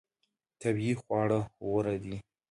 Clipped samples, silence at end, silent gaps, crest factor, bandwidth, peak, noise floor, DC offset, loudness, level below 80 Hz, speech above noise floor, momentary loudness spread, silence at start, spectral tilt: under 0.1%; 0.3 s; none; 16 dB; 11.5 kHz; -16 dBFS; -82 dBFS; under 0.1%; -32 LUFS; -60 dBFS; 51 dB; 9 LU; 0.6 s; -7.5 dB/octave